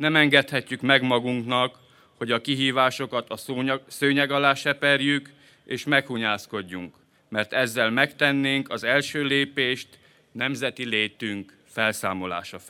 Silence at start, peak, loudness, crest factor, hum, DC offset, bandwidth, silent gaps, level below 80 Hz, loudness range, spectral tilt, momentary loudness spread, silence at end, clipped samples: 0 s; -2 dBFS; -23 LUFS; 22 dB; none; under 0.1%; 17 kHz; none; -72 dBFS; 3 LU; -4 dB/octave; 12 LU; 0 s; under 0.1%